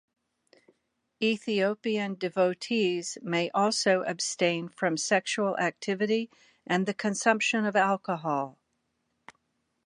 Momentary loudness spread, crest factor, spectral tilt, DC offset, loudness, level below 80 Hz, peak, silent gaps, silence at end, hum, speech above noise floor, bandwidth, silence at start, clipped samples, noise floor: 6 LU; 22 dB; -4 dB/octave; under 0.1%; -28 LUFS; -82 dBFS; -8 dBFS; none; 1.35 s; none; 50 dB; 11.5 kHz; 1.2 s; under 0.1%; -77 dBFS